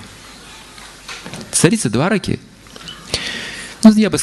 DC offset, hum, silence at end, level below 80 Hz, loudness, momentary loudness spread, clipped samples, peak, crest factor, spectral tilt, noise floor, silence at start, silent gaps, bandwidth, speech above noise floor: under 0.1%; none; 0 s; -44 dBFS; -16 LUFS; 25 LU; 0.6%; 0 dBFS; 18 dB; -4.5 dB/octave; -38 dBFS; 0 s; none; 12.5 kHz; 25 dB